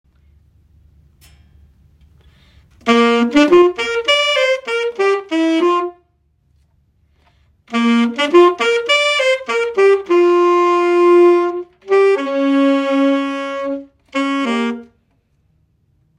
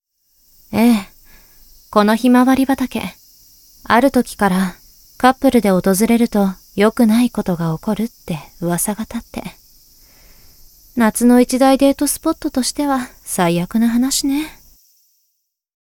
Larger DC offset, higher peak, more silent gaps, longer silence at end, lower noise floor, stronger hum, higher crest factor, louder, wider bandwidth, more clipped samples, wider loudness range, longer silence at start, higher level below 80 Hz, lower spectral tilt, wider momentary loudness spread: neither; about the same, 0 dBFS vs 0 dBFS; neither; second, 1.35 s vs 1.5 s; second, -60 dBFS vs -70 dBFS; neither; about the same, 16 dB vs 16 dB; about the same, -14 LUFS vs -16 LUFS; second, 10 kHz vs 18.5 kHz; neither; about the same, 7 LU vs 5 LU; first, 2.85 s vs 0.7 s; second, -56 dBFS vs -44 dBFS; second, -3.5 dB/octave vs -5 dB/octave; about the same, 11 LU vs 12 LU